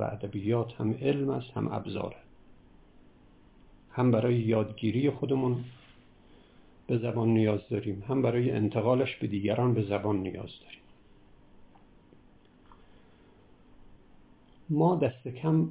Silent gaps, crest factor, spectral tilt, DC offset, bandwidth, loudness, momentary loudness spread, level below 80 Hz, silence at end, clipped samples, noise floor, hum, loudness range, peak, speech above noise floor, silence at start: none; 20 dB; -7.5 dB/octave; under 0.1%; 4 kHz; -29 LUFS; 11 LU; -60 dBFS; 0 s; under 0.1%; -58 dBFS; none; 7 LU; -12 dBFS; 30 dB; 0 s